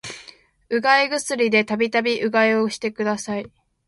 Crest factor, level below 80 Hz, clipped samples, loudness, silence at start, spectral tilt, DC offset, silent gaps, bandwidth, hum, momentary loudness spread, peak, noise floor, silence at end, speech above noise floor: 16 dB; -64 dBFS; under 0.1%; -20 LUFS; 0.05 s; -3.5 dB/octave; under 0.1%; none; 11.5 kHz; none; 11 LU; -6 dBFS; -48 dBFS; 0.4 s; 28 dB